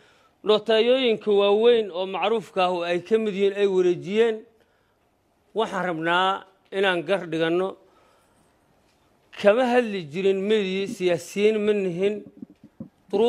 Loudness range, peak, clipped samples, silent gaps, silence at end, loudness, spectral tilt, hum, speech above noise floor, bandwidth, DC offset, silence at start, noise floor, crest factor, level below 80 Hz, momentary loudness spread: 4 LU; -6 dBFS; under 0.1%; none; 0 s; -23 LUFS; -5.5 dB/octave; none; 44 dB; 13 kHz; under 0.1%; 0.45 s; -66 dBFS; 18 dB; -72 dBFS; 9 LU